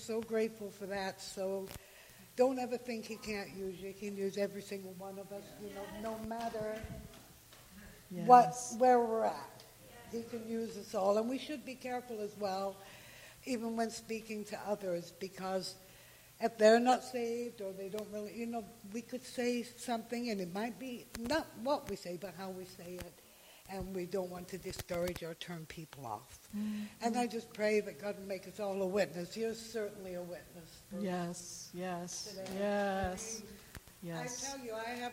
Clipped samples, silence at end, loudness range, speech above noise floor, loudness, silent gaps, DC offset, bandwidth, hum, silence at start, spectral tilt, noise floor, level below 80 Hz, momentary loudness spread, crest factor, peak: under 0.1%; 0 s; 11 LU; 22 dB; -37 LUFS; none; under 0.1%; 16 kHz; none; 0 s; -4.5 dB/octave; -59 dBFS; -66 dBFS; 16 LU; 28 dB; -10 dBFS